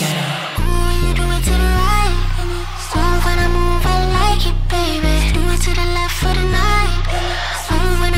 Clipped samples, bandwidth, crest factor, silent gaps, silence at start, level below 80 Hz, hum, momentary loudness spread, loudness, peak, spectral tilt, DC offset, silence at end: under 0.1%; 16 kHz; 12 dB; none; 0 s; -16 dBFS; none; 5 LU; -17 LUFS; -2 dBFS; -4.5 dB/octave; under 0.1%; 0 s